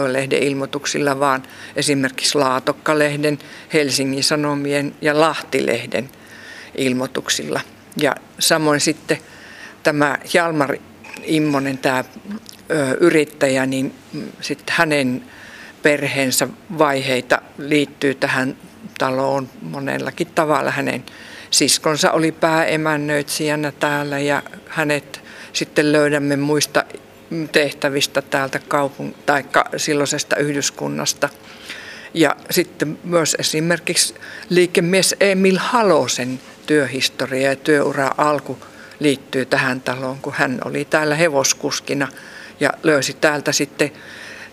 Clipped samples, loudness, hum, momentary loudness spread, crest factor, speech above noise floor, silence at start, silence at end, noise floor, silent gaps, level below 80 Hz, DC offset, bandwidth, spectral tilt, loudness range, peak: under 0.1%; -18 LUFS; none; 14 LU; 20 dB; 20 dB; 0 s; 0.05 s; -39 dBFS; none; -62 dBFS; under 0.1%; 15.5 kHz; -3.5 dB/octave; 3 LU; 0 dBFS